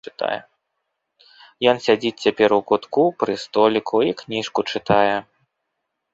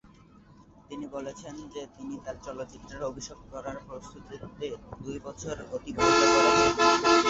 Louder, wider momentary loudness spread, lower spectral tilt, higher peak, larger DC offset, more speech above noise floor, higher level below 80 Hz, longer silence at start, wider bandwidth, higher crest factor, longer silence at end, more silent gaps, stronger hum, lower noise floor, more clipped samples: first, -20 LUFS vs -25 LUFS; second, 9 LU vs 22 LU; first, -5 dB/octave vs -3 dB/octave; first, -2 dBFS vs -10 dBFS; neither; first, 58 dB vs 27 dB; about the same, -58 dBFS vs -54 dBFS; second, 0.05 s vs 0.9 s; about the same, 7.8 kHz vs 8 kHz; about the same, 20 dB vs 20 dB; first, 0.95 s vs 0 s; neither; neither; first, -77 dBFS vs -55 dBFS; neither